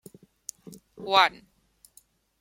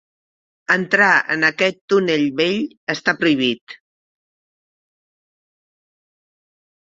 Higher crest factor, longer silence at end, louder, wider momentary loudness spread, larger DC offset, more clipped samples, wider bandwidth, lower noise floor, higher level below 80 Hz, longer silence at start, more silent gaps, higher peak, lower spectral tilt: first, 26 dB vs 20 dB; second, 1.1 s vs 3.2 s; second, -22 LUFS vs -17 LUFS; first, 22 LU vs 9 LU; neither; neither; first, 16.5 kHz vs 7.8 kHz; second, -61 dBFS vs under -90 dBFS; second, -72 dBFS vs -66 dBFS; first, 1 s vs 0.7 s; second, none vs 1.81-1.88 s, 2.77-2.87 s, 3.61-3.67 s; about the same, -4 dBFS vs -2 dBFS; second, -1.5 dB/octave vs -4.5 dB/octave